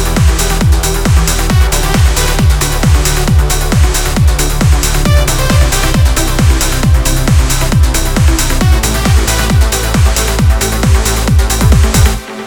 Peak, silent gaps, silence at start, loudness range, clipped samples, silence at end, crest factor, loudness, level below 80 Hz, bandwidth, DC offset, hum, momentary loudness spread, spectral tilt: 0 dBFS; none; 0 s; 0 LU; 0.4%; 0 s; 8 dB; -11 LUFS; -12 dBFS; over 20 kHz; 0.4%; none; 1 LU; -4.5 dB/octave